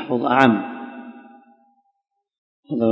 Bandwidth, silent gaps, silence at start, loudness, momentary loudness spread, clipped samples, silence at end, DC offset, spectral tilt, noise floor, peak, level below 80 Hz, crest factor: 8 kHz; 2.38-2.63 s; 0 s; -19 LUFS; 23 LU; under 0.1%; 0 s; under 0.1%; -7 dB/octave; -62 dBFS; 0 dBFS; -66 dBFS; 22 dB